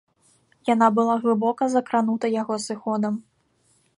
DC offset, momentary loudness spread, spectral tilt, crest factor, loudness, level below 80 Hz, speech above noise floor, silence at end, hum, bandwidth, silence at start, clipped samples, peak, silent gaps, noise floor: under 0.1%; 9 LU; -5.5 dB/octave; 20 dB; -23 LUFS; -72 dBFS; 43 dB; 0.75 s; none; 11 kHz; 0.65 s; under 0.1%; -4 dBFS; none; -65 dBFS